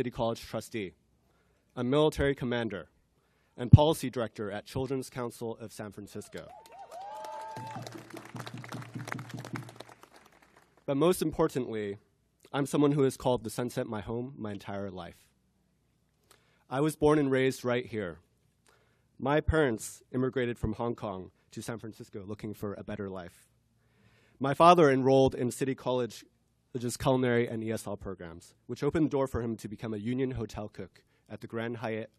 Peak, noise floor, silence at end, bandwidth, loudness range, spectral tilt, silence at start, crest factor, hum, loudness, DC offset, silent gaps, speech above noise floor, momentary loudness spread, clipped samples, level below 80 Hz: -2 dBFS; -72 dBFS; 0.1 s; 14 kHz; 15 LU; -6.5 dB/octave; 0 s; 28 dB; none; -30 LUFS; under 0.1%; none; 42 dB; 19 LU; under 0.1%; -52 dBFS